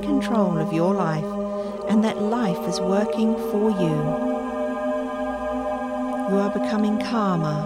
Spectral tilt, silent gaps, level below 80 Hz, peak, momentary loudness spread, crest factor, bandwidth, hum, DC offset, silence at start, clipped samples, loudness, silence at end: -7 dB/octave; none; -50 dBFS; -8 dBFS; 6 LU; 14 dB; 14.5 kHz; none; under 0.1%; 0 s; under 0.1%; -23 LUFS; 0 s